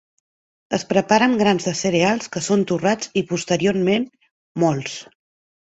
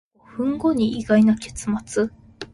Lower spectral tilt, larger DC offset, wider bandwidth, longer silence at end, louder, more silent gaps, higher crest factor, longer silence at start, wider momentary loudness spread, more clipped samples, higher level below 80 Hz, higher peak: about the same, -5 dB/octave vs -6 dB/octave; neither; second, 8.2 kHz vs 11.5 kHz; first, 0.75 s vs 0.1 s; about the same, -20 LUFS vs -21 LUFS; first, 4.31-4.55 s vs none; about the same, 18 dB vs 16 dB; first, 0.7 s vs 0.35 s; about the same, 10 LU vs 11 LU; neither; second, -58 dBFS vs -48 dBFS; first, -2 dBFS vs -6 dBFS